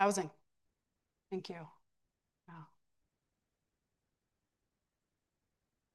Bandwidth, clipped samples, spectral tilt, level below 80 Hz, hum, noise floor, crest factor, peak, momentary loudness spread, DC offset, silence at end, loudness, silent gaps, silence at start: 12 kHz; under 0.1%; -4 dB/octave; -88 dBFS; none; -88 dBFS; 28 dB; -16 dBFS; 20 LU; under 0.1%; 3.3 s; -41 LUFS; none; 0 s